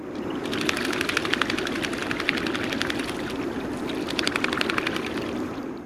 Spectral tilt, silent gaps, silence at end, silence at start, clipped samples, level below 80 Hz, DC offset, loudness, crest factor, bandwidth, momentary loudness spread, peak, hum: -3.5 dB/octave; none; 0 s; 0 s; under 0.1%; -50 dBFS; under 0.1%; -26 LUFS; 28 dB; 16 kHz; 6 LU; 0 dBFS; none